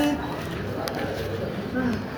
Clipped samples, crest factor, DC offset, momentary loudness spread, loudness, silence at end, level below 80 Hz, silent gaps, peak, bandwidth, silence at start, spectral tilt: under 0.1%; 22 dB; under 0.1%; 4 LU; -29 LUFS; 0 s; -44 dBFS; none; -6 dBFS; over 20 kHz; 0 s; -6 dB/octave